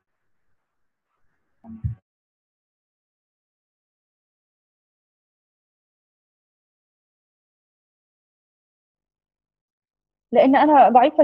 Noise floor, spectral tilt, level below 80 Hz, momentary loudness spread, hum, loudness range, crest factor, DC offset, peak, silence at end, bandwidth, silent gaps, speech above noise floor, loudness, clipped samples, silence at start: -77 dBFS; -9 dB/octave; -52 dBFS; 20 LU; none; 21 LU; 22 dB; under 0.1%; -2 dBFS; 0 s; 5.4 kHz; 2.02-8.95 s, 9.61-9.82 s; 62 dB; -15 LUFS; under 0.1%; 1.7 s